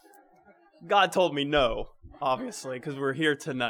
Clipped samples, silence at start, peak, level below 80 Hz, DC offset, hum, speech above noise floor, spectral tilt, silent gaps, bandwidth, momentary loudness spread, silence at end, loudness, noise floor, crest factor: under 0.1%; 0.8 s; -10 dBFS; -50 dBFS; under 0.1%; none; 32 dB; -4.5 dB/octave; none; 18.5 kHz; 12 LU; 0 s; -27 LUFS; -59 dBFS; 20 dB